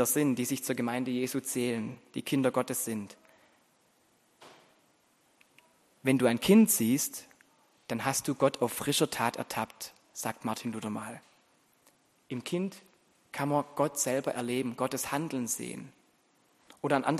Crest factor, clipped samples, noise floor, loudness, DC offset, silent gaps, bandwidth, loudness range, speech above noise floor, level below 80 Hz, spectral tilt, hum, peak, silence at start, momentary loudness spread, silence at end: 22 dB; under 0.1%; -68 dBFS; -31 LUFS; under 0.1%; none; 13 kHz; 10 LU; 38 dB; -70 dBFS; -4 dB/octave; none; -10 dBFS; 0 s; 13 LU; 0 s